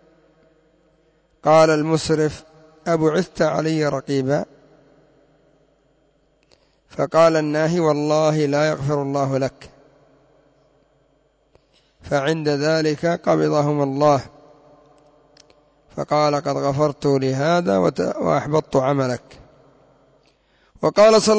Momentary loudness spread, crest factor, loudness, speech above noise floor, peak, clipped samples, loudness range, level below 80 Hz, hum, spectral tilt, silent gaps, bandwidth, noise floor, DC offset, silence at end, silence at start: 9 LU; 16 dB; -19 LUFS; 43 dB; -4 dBFS; under 0.1%; 7 LU; -54 dBFS; none; -6 dB/octave; none; 8 kHz; -61 dBFS; under 0.1%; 0 s; 1.45 s